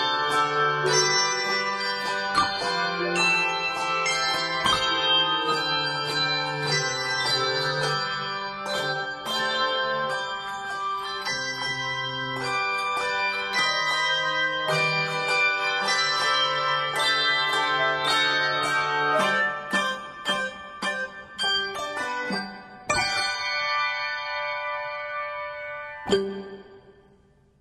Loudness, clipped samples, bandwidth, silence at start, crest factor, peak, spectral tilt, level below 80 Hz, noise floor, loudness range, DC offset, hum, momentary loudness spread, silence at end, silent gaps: -24 LUFS; under 0.1%; 16 kHz; 0 s; 18 dB; -8 dBFS; -2 dB/octave; -60 dBFS; -59 dBFS; 5 LU; under 0.1%; none; 9 LU; 0.7 s; none